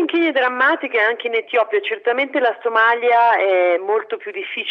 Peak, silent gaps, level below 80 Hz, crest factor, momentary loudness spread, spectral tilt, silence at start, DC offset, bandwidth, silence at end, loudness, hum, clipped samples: -4 dBFS; none; -82 dBFS; 12 dB; 8 LU; -4 dB/octave; 0 s; under 0.1%; 6.2 kHz; 0 s; -17 LUFS; none; under 0.1%